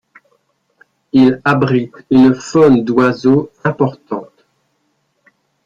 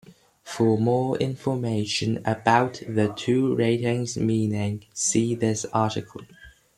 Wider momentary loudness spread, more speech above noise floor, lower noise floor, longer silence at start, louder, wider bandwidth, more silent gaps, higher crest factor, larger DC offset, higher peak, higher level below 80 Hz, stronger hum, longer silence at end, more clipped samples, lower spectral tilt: about the same, 9 LU vs 7 LU; first, 52 dB vs 21 dB; first, -64 dBFS vs -44 dBFS; first, 1.15 s vs 0.1 s; first, -13 LUFS vs -24 LUFS; second, 7.6 kHz vs 13 kHz; neither; second, 14 dB vs 20 dB; neither; first, 0 dBFS vs -4 dBFS; first, -50 dBFS vs -60 dBFS; neither; first, 1.45 s vs 0.25 s; neither; first, -7.5 dB/octave vs -5 dB/octave